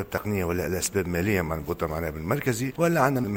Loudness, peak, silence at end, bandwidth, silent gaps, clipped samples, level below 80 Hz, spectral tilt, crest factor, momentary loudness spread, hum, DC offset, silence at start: -26 LUFS; -6 dBFS; 0 s; 17 kHz; none; under 0.1%; -44 dBFS; -5.5 dB/octave; 20 dB; 7 LU; none; under 0.1%; 0 s